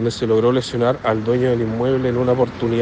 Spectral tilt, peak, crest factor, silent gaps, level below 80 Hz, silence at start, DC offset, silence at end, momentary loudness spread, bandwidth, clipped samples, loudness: -7 dB/octave; -4 dBFS; 14 dB; none; -46 dBFS; 0 s; under 0.1%; 0 s; 3 LU; 9.4 kHz; under 0.1%; -18 LUFS